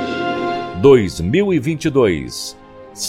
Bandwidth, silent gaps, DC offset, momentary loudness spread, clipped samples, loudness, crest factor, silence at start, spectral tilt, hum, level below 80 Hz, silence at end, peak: 15.5 kHz; none; under 0.1%; 13 LU; under 0.1%; -16 LUFS; 16 dB; 0 s; -5.5 dB/octave; none; -42 dBFS; 0 s; 0 dBFS